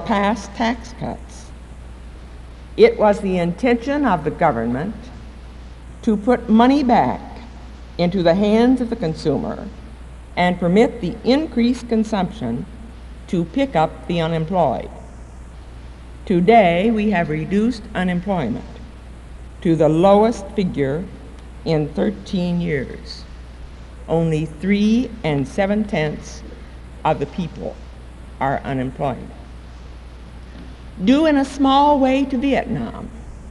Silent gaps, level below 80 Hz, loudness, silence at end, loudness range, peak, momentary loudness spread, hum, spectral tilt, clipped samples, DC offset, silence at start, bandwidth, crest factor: none; -36 dBFS; -19 LUFS; 0 s; 6 LU; 0 dBFS; 24 LU; none; -7 dB/octave; under 0.1%; under 0.1%; 0 s; 11.5 kHz; 18 dB